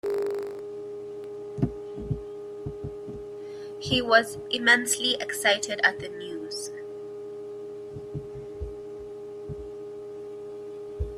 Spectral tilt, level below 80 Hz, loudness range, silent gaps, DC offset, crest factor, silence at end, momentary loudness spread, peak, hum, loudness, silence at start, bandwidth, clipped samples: -3 dB/octave; -50 dBFS; 15 LU; none; under 0.1%; 26 dB; 0 s; 18 LU; -4 dBFS; none; -28 LUFS; 0.05 s; 15.5 kHz; under 0.1%